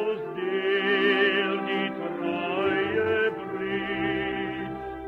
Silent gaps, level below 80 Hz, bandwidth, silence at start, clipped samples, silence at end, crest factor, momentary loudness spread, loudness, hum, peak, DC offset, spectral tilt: none; -56 dBFS; 5.6 kHz; 0 s; under 0.1%; 0 s; 16 dB; 9 LU; -26 LUFS; none; -10 dBFS; under 0.1%; -7 dB/octave